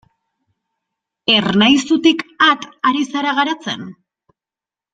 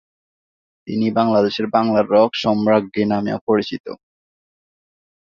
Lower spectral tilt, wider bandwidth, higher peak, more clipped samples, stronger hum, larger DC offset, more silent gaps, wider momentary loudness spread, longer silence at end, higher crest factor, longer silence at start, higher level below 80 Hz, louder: second, -4 dB/octave vs -7 dB/octave; first, 9.2 kHz vs 7 kHz; about the same, 0 dBFS vs -2 dBFS; neither; neither; neither; second, none vs 3.41-3.47 s, 3.80-3.84 s; about the same, 11 LU vs 12 LU; second, 1 s vs 1.35 s; about the same, 18 dB vs 18 dB; first, 1.3 s vs 0.85 s; about the same, -58 dBFS vs -58 dBFS; first, -15 LUFS vs -18 LUFS